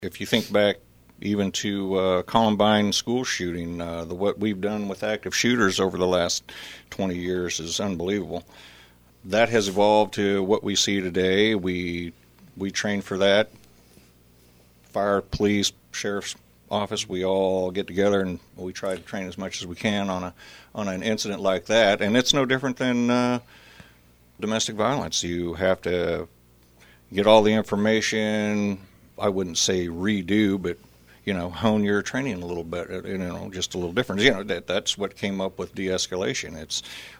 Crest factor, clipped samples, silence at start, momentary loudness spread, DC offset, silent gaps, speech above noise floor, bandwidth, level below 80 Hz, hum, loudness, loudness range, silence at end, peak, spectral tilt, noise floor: 22 dB; under 0.1%; 0 s; 12 LU; under 0.1%; none; 31 dB; over 20 kHz; -54 dBFS; none; -24 LUFS; 5 LU; 0 s; -2 dBFS; -4 dB/octave; -55 dBFS